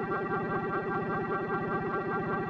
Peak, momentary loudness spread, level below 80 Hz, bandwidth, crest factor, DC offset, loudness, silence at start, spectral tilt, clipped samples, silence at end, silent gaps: -20 dBFS; 0 LU; -58 dBFS; 6.2 kHz; 12 dB; under 0.1%; -32 LUFS; 0 s; -9 dB/octave; under 0.1%; 0 s; none